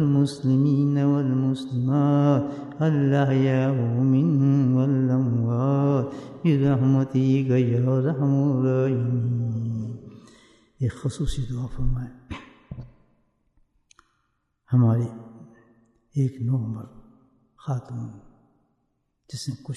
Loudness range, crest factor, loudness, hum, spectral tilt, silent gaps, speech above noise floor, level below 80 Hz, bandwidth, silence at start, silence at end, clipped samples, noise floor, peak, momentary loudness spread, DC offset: 11 LU; 16 dB; -23 LUFS; none; -9 dB/octave; none; 51 dB; -44 dBFS; 10.5 kHz; 0 s; 0 s; under 0.1%; -73 dBFS; -8 dBFS; 16 LU; under 0.1%